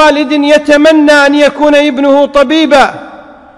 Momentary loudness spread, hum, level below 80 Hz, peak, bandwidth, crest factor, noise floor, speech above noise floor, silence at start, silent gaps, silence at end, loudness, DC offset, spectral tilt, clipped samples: 3 LU; none; -40 dBFS; 0 dBFS; 12 kHz; 6 dB; -32 dBFS; 25 dB; 0 s; none; 0.4 s; -6 LUFS; under 0.1%; -3 dB/octave; 8%